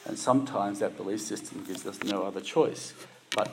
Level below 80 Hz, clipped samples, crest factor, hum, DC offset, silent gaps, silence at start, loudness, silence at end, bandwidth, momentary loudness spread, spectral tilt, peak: -82 dBFS; under 0.1%; 22 dB; none; under 0.1%; none; 0 s; -31 LUFS; 0 s; 16 kHz; 12 LU; -4.5 dB/octave; -8 dBFS